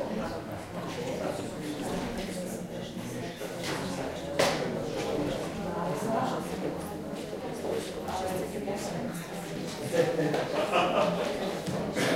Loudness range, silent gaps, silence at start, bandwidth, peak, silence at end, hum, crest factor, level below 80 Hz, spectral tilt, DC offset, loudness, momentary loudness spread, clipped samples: 5 LU; none; 0 s; 16 kHz; -10 dBFS; 0 s; none; 22 dB; -54 dBFS; -5 dB/octave; under 0.1%; -32 LUFS; 10 LU; under 0.1%